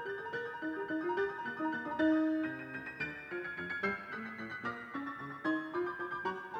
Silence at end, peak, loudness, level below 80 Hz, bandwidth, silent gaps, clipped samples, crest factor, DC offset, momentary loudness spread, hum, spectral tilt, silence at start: 0 s; -20 dBFS; -37 LUFS; -74 dBFS; 6.8 kHz; none; under 0.1%; 16 dB; under 0.1%; 10 LU; none; -6.5 dB/octave; 0 s